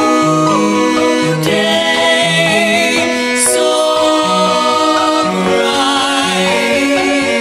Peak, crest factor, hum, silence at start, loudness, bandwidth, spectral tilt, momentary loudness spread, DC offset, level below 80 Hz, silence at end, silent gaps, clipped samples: 0 dBFS; 12 dB; none; 0 s; -11 LUFS; 16 kHz; -3 dB/octave; 2 LU; under 0.1%; -50 dBFS; 0 s; none; under 0.1%